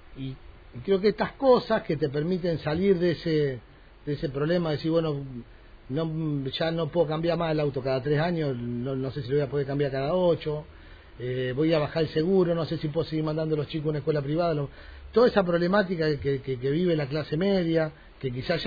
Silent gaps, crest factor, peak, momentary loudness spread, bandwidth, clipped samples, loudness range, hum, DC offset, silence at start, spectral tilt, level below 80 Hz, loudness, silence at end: none; 18 dB; -8 dBFS; 11 LU; 5 kHz; under 0.1%; 3 LU; none; under 0.1%; 0 s; -9 dB/octave; -50 dBFS; -27 LUFS; 0 s